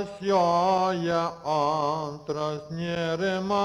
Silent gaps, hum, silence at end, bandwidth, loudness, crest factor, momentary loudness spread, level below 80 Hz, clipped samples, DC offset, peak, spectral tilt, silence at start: none; none; 0 s; 12 kHz; -26 LUFS; 14 dB; 9 LU; -60 dBFS; under 0.1%; under 0.1%; -12 dBFS; -6 dB/octave; 0 s